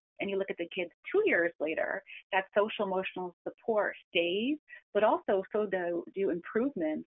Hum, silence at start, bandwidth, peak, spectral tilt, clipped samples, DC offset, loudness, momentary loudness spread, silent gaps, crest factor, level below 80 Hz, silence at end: none; 0.2 s; 3.9 kHz; -14 dBFS; -0.5 dB/octave; under 0.1%; under 0.1%; -32 LUFS; 9 LU; 0.94-1.03 s, 1.55-1.59 s, 2.24-2.30 s, 3.33-3.45 s, 4.04-4.12 s, 4.59-4.67 s, 4.82-4.93 s; 18 dB; -74 dBFS; 0.05 s